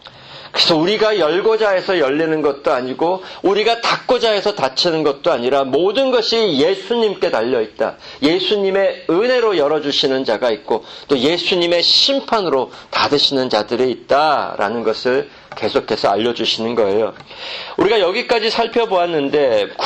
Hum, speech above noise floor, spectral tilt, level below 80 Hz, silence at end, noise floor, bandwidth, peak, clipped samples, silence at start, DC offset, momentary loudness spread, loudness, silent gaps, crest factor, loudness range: none; 21 dB; -4 dB/octave; -54 dBFS; 0 s; -37 dBFS; 8.8 kHz; -2 dBFS; under 0.1%; 0.05 s; under 0.1%; 6 LU; -16 LUFS; none; 14 dB; 3 LU